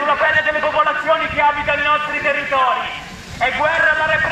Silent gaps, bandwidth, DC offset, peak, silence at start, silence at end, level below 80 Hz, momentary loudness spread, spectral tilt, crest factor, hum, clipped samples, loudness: none; 13 kHz; under 0.1%; -2 dBFS; 0 s; 0 s; -44 dBFS; 7 LU; -3.5 dB/octave; 14 dB; none; under 0.1%; -16 LUFS